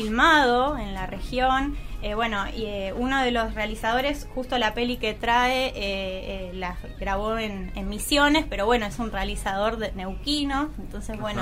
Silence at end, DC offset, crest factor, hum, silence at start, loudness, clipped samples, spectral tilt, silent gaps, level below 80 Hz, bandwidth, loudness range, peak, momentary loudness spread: 0 s; under 0.1%; 18 dB; none; 0 s; -25 LUFS; under 0.1%; -4 dB/octave; none; -36 dBFS; 16 kHz; 2 LU; -6 dBFS; 12 LU